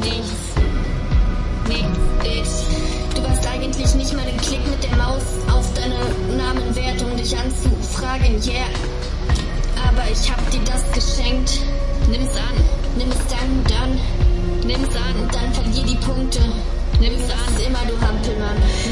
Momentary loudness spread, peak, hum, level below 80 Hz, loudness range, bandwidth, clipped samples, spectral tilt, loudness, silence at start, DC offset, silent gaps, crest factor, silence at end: 3 LU; -4 dBFS; none; -18 dBFS; 1 LU; 11.5 kHz; under 0.1%; -5 dB/octave; -21 LUFS; 0 s; under 0.1%; none; 14 dB; 0 s